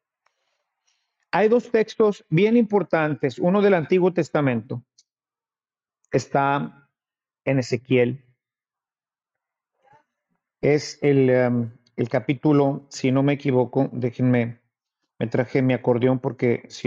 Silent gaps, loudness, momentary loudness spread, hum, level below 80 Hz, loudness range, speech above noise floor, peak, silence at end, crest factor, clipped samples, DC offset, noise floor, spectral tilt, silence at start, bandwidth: none; -22 LUFS; 8 LU; none; -64 dBFS; 7 LU; over 69 dB; -8 dBFS; 0.05 s; 16 dB; under 0.1%; under 0.1%; under -90 dBFS; -7.5 dB/octave; 1.35 s; 7.8 kHz